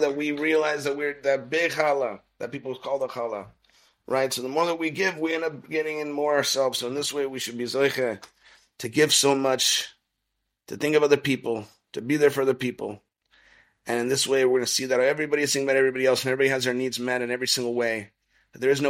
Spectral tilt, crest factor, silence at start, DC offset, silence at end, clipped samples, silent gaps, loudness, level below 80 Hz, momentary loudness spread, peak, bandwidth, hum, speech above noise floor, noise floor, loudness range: -3 dB/octave; 22 dB; 0 s; under 0.1%; 0 s; under 0.1%; none; -24 LUFS; -70 dBFS; 12 LU; -4 dBFS; 16 kHz; none; 55 dB; -79 dBFS; 5 LU